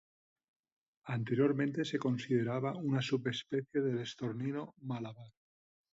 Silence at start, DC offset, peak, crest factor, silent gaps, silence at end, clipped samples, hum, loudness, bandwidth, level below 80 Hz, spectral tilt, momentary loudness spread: 1.05 s; under 0.1%; -18 dBFS; 18 dB; none; 0.6 s; under 0.1%; none; -36 LUFS; 8 kHz; -76 dBFS; -7 dB/octave; 11 LU